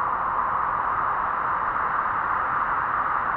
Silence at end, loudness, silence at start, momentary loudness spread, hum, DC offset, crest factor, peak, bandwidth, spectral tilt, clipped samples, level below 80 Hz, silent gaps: 0 s; -24 LUFS; 0 s; 1 LU; none; under 0.1%; 12 dB; -12 dBFS; 5 kHz; -7.5 dB/octave; under 0.1%; -50 dBFS; none